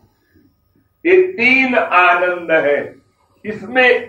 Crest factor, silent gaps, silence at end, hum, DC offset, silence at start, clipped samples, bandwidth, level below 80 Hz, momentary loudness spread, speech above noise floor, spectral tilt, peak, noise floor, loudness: 14 dB; none; 0 s; none; under 0.1%; 1.05 s; under 0.1%; 7.6 kHz; -62 dBFS; 17 LU; 46 dB; -5.5 dB/octave; -2 dBFS; -59 dBFS; -13 LUFS